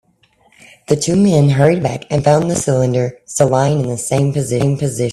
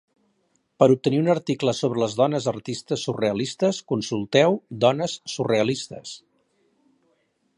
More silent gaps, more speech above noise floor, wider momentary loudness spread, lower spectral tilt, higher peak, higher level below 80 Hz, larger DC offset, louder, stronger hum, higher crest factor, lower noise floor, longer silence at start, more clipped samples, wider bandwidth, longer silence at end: neither; second, 41 dB vs 47 dB; second, 7 LU vs 10 LU; about the same, -6 dB/octave vs -5.5 dB/octave; about the same, 0 dBFS vs -2 dBFS; first, -46 dBFS vs -64 dBFS; neither; first, -15 LUFS vs -23 LUFS; neither; second, 14 dB vs 22 dB; second, -55 dBFS vs -69 dBFS; about the same, 0.9 s vs 0.8 s; neither; first, 13 kHz vs 11.5 kHz; second, 0 s vs 1.4 s